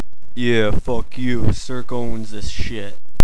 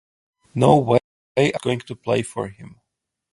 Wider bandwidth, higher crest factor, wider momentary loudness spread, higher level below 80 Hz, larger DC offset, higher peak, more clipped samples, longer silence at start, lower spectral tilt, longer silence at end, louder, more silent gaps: about the same, 11 kHz vs 11.5 kHz; second, 16 dB vs 22 dB; about the same, 12 LU vs 14 LU; first, -30 dBFS vs -54 dBFS; first, 20% vs under 0.1%; about the same, 0 dBFS vs 0 dBFS; first, 1% vs under 0.1%; second, 0 s vs 0.55 s; about the same, -6 dB/octave vs -6.5 dB/octave; second, 0 s vs 0.65 s; second, -23 LUFS vs -20 LUFS; second, none vs 1.04-1.35 s